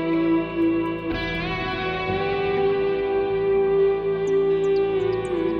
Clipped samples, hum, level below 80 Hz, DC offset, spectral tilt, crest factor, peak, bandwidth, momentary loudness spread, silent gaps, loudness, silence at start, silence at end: under 0.1%; none; -44 dBFS; under 0.1%; -7 dB/octave; 10 dB; -12 dBFS; 9 kHz; 5 LU; none; -23 LUFS; 0 s; 0 s